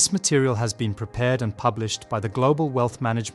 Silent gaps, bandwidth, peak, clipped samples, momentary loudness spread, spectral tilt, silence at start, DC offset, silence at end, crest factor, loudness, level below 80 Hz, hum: none; 12 kHz; -6 dBFS; under 0.1%; 7 LU; -4.5 dB/octave; 0 s; under 0.1%; 0 s; 16 dB; -23 LUFS; -52 dBFS; none